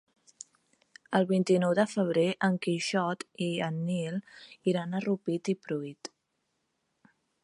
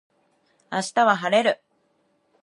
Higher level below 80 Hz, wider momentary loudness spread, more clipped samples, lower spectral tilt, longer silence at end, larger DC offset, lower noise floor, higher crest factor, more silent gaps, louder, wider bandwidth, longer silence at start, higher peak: about the same, -78 dBFS vs -78 dBFS; first, 20 LU vs 11 LU; neither; first, -6 dB/octave vs -3.5 dB/octave; first, 1.35 s vs 0.9 s; neither; first, -79 dBFS vs -67 dBFS; about the same, 20 dB vs 20 dB; neither; second, -30 LUFS vs -22 LUFS; about the same, 11.5 kHz vs 11.5 kHz; first, 1.1 s vs 0.7 s; second, -12 dBFS vs -6 dBFS